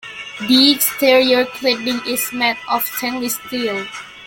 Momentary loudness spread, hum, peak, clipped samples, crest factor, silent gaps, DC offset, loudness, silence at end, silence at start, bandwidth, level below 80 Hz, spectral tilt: 11 LU; none; 0 dBFS; under 0.1%; 16 dB; none; under 0.1%; -16 LUFS; 0 s; 0.05 s; 17 kHz; -58 dBFS; -2 dB/octave